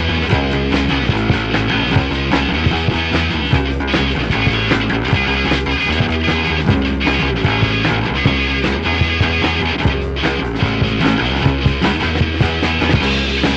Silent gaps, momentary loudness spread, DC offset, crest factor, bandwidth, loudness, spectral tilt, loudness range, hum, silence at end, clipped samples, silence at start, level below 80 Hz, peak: none; 2 LU; under 0.1%; 14 dB; 8.2 kHz; -16 LUFS; -6 dB/octave; 1 LU; none; 0 s; under 0.1%; 0 s; -24 dBFS; -2 dBFS